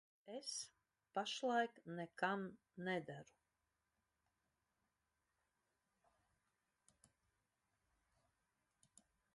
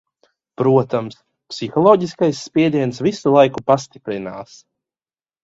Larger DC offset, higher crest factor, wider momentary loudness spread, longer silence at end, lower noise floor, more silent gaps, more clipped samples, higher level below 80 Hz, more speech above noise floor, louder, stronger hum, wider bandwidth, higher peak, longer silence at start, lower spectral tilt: neither; first, 24 dB vs 18 dB; about the same, 15 LU vs 15 LU; first, 6.1 s vs 1 s; about the same, -89 dBFS vs under -90 dBFS; neither; neither; second, under -90 dBFS vs -58 dBFS; second, 44 dB vs over 73 dB; second, -45 LUFS vs -17 LUFS; neither; first, 11 kHz vs 8 kHz; second, -26 dBFS vs 0 dBFS; second, 0.25 s vs 0.6 s; second, -3.5 dB/octave vs -6.5 dB/octave